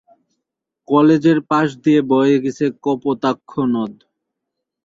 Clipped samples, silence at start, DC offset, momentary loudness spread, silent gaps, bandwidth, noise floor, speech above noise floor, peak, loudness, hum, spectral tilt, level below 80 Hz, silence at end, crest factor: under 0.1%; 0.9 s; under 0.1%; 8 LU; none; 7.6 kHz; -79 dBFS; 64 dB; -2 dBFS; -16 LUFS; none; -7.5 dB/octave; -62 dBFS; 0.9 s; 16 dB